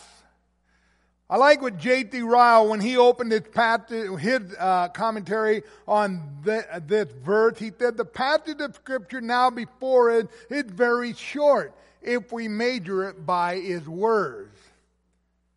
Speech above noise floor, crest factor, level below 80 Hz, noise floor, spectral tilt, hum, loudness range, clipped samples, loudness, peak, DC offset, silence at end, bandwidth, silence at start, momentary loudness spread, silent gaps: 47 dB; 20 dB; -66 dBFS; -70 dBFS; -5 dB/octave; none; 6 LU; under 0.1%; -23 LUFS; -4 dBFS; under 0.1%; 1.1 s; 11.5 kHz; 1.3 s; 12 LU; none